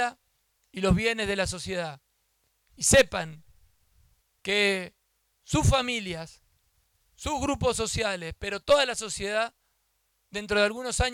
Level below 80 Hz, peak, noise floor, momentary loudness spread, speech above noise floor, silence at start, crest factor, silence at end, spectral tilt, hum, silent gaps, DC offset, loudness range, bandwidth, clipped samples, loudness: -44 dBFS; -12 dBFS; -73 dBFS; 15 LU; 47 dB; 0 s; 18 dB; 0 s; -3.5 dB/octave; none; none; under 0.1%; 2 LU; 18.5 kHz; under 0.1%; -26 LUFS